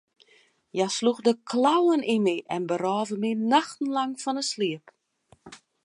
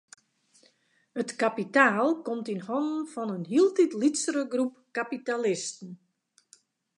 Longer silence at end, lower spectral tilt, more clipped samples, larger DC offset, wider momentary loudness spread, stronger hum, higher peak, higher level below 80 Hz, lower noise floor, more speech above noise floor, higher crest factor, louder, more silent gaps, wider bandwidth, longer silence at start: second, 0.3 s vs 1 s; about the same, -4.5 dB/octave vs -4 dB/octave; neither; neither; second, 7 LU vs 12 LU; neither; about the same, -8 dBFS vs -6 dBFS; first, -78 dBFS vs -84 dBFS; second, -62 dBFS vs -67 dBFS; about the same, 37 dB vs 40 dB; about the same, 18 dB vs 22 dB; about the same, -25 LUFS vs -27 LUFS; neither; about the same, 11 kHz vs 11 kHz; second, 0.75 s vs 1.15 s